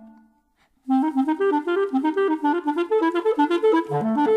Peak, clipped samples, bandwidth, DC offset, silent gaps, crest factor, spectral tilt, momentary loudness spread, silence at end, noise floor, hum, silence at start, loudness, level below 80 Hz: -10 dBFS; under 0.1%; 10.5 kHz; under 0.1%; none; 12 dB; -7 dB/octave; 4 LU; 0 s; -64 dBFS; none; 0 s; -22 LUFS; -72 dBFS